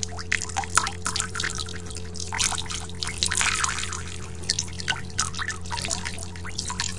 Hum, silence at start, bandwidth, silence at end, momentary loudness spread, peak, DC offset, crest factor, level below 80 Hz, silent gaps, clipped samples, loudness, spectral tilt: none; 0 s; 11.5 kHz; 0 s; 11 LU; 0 dBFS; 1%; 28 dB; -44 dBFS; none; under 0.1%; -27 LUFS; -1.5 dB/octave